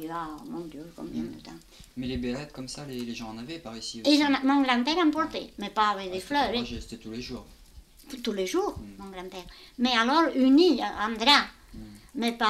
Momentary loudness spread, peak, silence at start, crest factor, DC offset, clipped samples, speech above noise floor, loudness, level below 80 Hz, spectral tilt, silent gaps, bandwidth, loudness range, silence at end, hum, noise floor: 21 LU; -6 dBFS; 0 s; 22 dB; under 0.1%; under 0.1%; 24 dB; -26 LUFS; -52 dBFS; -4 dB/octave; none; 15 kHz; 12 LU; 0 s; none; -51 dBFS